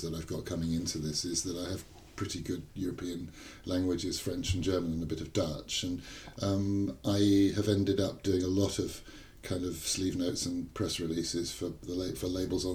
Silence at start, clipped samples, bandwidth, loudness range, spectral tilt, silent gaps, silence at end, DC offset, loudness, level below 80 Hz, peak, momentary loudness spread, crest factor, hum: 0 s; under 0.1%; 18.5 kHz; 6 LU; -5 dB/octave; none; 0 s; under 0.1%; -33 LUFS; -52 dBFS; -14 dBFS; 10 LU; 18 dB; none